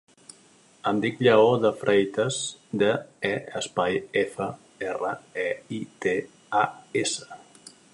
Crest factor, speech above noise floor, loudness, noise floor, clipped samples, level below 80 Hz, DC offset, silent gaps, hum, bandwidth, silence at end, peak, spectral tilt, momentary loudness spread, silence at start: 20 dB; 32 dB; -26 LUFS; -57 dBFS; under 0.1%; -66 dBFS; under 0.1%; none; none; 11.5 kHz; 0.25 s; -6 dBFS; -4.5 dB/octave; 13 LU; 0.85 s